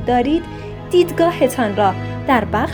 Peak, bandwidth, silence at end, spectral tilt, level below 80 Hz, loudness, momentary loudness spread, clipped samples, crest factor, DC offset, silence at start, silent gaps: -2 dBFS; over 20 kHz; 0 s; -6 dB/octave; -38 dBFS; -17 LUFS; 7 LU; under 0.1%; 16 dB; under 0.1%; 0 s; none